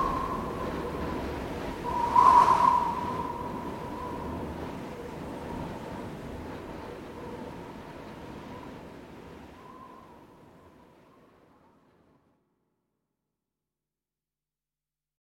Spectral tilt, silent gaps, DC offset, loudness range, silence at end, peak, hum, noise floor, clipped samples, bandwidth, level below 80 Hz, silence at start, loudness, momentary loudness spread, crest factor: -6 dB/octave; none; under 0.1%; 22 LU; 4.55 s; -8 dBFS; none; under -90 dBFS; under 0.1%; 16.5 kHz; -50 dBFS; 0 s; -28 LUFS; 25 LU; 24 dB